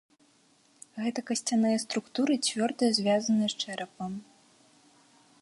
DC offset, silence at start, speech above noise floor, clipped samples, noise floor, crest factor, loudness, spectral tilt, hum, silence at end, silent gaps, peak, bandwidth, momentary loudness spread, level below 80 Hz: under 0.1%; 0.95 s; 36 dB; under 0.1%; -64 dBFS; 18 dB; -29 LUFS; -3.5 dB/octave; none; 1.2 s; none; -12 dBFS; 11.5 kHz; 12 LU; -74 dBFS